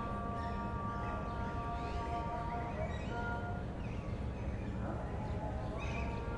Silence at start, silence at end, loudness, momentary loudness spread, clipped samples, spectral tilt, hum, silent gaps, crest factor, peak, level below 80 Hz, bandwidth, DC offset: 0 s; 0 s; -40 LUFS; 2 LU; under 0.1%; -7.5 dB/octave; none; none; 12 dB; -26 dBFS; -44 dBFS; 10.5 kHz; under 0.1%